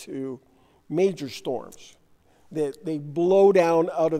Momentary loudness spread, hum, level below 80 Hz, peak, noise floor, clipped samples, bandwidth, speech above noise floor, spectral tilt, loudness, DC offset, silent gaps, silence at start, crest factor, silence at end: 18 LU; none; -68 dBFS; -8 dBFS; -58 dBFS; under 0.1%; 13.5 kHz; 35 dB; -6.5 dB/octave; -23 LUFS; under 0.1%; none; 0 s; 16 dB; 0 s